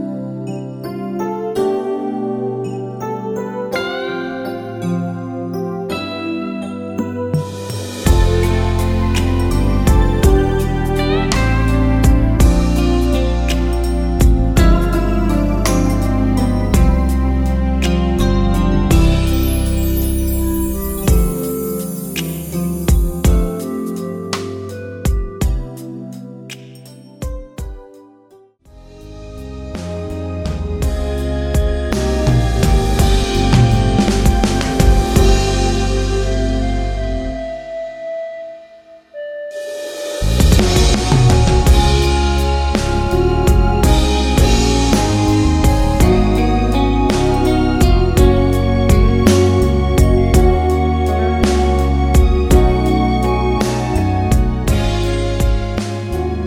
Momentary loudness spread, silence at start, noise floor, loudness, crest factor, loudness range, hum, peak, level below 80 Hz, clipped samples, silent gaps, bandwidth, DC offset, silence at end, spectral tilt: 13 LU; 0 s; -47 dBFS; -16 LUFS; 14 dB; 11 LU; none; 0 dBFS; -18 dBFS; under 0.1%; none; 18 kHz; under 0.1%; 0 s; -6 dB/octave